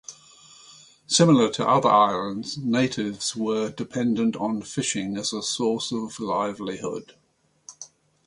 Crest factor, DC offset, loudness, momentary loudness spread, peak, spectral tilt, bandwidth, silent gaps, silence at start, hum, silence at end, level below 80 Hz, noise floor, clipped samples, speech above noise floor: 20 dB; under 0.1%; -24 LUFS; 14 LU; -4 dBFS; -4.5 dB/octave; 11.5 kHz; none; 0.1 s; none; 0.4 s; -64 dBFS; -51 dBFS; under 0.1%; 28 dB